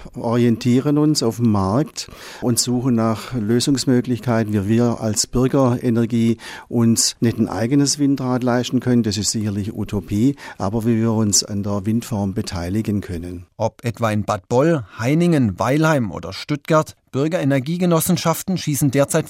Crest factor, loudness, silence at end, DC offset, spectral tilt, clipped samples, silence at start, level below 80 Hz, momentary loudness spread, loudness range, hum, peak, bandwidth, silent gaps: 16 dB; -19 LUFS; 0 s; under 0.1%; -5 dB/octave; under 0.1%; 0 s; -46 dBFS; 8 LU; 3 LU; none; -2 dBFS; 16 kHz; none